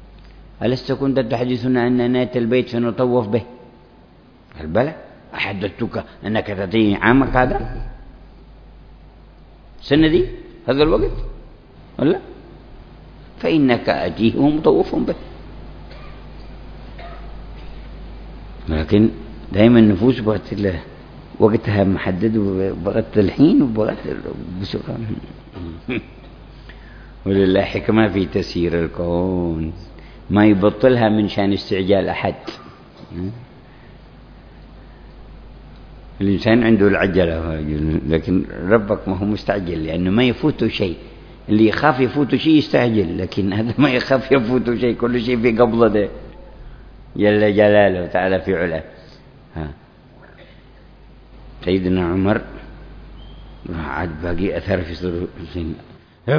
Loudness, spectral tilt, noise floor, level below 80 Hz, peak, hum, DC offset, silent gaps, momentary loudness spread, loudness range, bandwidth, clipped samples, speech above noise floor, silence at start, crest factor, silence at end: -18 LUFS; -8.5 dB/octave; -47 dBFS; -36 dBFS; 0 dBFS; none; under 0.1%; none; 23 LU; 9 LU; 5.4 kHz; under 0.1%; 30 dB; 0 s; 18 dB; 0 s